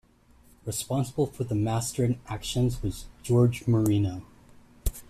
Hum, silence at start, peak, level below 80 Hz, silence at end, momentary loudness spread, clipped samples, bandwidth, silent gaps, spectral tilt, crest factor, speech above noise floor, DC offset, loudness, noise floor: none; 0.65 s; -12 dBFS; -42 dBFS; 0.05 s; 13 LU; under 0.1%; 14.5 kHz; none; -6.5 dB/octave; 16 dB; 32 dB; under 0.1%; -28 LUFS; -58 dBFS